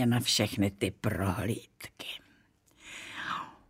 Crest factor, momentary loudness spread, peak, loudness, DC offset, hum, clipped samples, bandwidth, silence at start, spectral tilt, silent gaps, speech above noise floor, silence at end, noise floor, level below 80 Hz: 20 dB; 18 LU; -14 dBFS; -32 LUFS; under 0.1%; none; under 0.1%; 16 kHz; 0 s; -4.5 dB/octave; none; 34 dB; 0.15 s; -65 dBFS; -60 dBFS